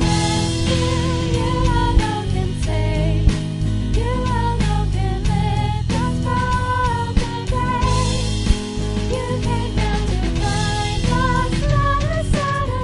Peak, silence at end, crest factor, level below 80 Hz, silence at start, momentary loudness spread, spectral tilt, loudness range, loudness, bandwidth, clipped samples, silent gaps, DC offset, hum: -2 dBFS; 0 s; 16 dB; -24 dBFS; 0 s; 4 LU; -5.5 dB/octave; 1 LU; -20 LUFS; 11.5 kHz; under 0.1%; none; under 0.1%; none